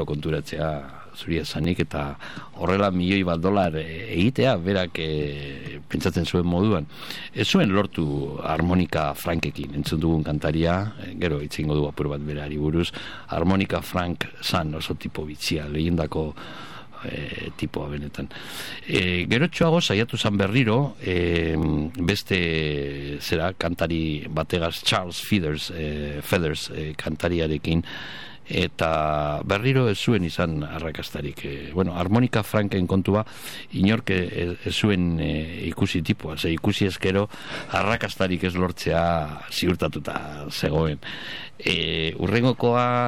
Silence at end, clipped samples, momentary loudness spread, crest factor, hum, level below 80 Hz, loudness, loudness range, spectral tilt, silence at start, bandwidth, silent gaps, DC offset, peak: 0 s; under 0.1%; 11 LU; 20 dB; none; -42 dBFS; -24 LUFS; 3 LU; -6 dB/octave; 0 s; 17 kHz; none; 0.8%; -4 dBFS